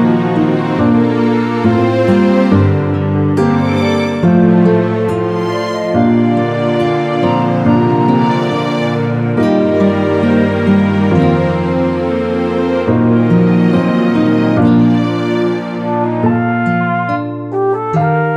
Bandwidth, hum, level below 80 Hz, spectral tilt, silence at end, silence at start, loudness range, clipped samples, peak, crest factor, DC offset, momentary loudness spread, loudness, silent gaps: 8.6 kHz; none; -44 dBFS; -8.5 dB/octave; 0 s; 0 s; 2 LU; under 0.1%; 0 dBFS; 12 dB; under 0.1%; 5 LU; -13 LUFS; none